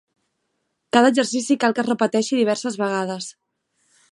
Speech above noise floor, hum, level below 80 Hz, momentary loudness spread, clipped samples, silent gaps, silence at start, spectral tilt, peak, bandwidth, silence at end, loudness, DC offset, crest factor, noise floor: 54 dB; none; -74 dBFS; 10 LU; under 0.1%; none; 0.95 s; -4 dB/octave; -2 dBFS; 11.5 kHz; 0.8 s; -20 LUFS; under 0.1%; 20 dB; -74 dBFS